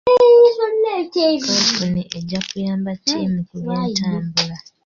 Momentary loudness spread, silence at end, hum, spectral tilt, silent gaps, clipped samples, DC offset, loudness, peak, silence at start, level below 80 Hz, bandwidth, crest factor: 14 LU; 0.25 s; none; -4.5 dB/octave; none; under 0.1%; under 0.1%; -17 LUFS; -2 dBFS; 0.05 s; -52 dBFS; 7.4 kHz; 14 dB